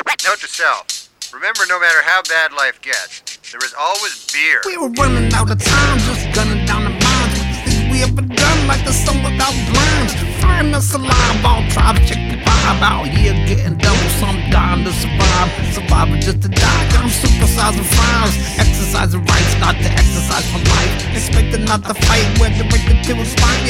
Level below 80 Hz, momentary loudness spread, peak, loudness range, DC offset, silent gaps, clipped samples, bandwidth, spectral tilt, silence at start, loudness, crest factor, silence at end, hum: -18 dBFS; 5 LU; 0 dBFS; 2 LU; under 0.1%; none; under 0.1%; 16.5 kHz; -4 dB/octave; 0.05 s; -14 LUFS; 14 dB; 0 s; none